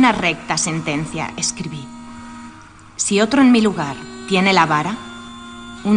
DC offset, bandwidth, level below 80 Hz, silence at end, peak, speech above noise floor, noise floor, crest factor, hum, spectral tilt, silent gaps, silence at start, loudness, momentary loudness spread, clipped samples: under 0.1%; 10 kHz; -48 dBFS; 0 s; -2 dBFS; 24 dB; -41 dBFS; 16 dB; none; -4 dB/octave; none; 0 s; -17 LUFS; 22 LU; under 0.1%